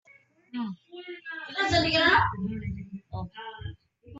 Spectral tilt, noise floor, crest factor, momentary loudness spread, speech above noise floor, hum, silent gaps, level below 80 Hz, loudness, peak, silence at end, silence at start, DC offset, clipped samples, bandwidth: -4.5 dB/octave; -60 dBFS; 20 dB; 20 LU; 33 dB; none; none; -50 dBFS; -26 LUFS; -8 dBFS; 0 s; 0.55 s; under 0.1%; under 0.1%; 8.2 kHz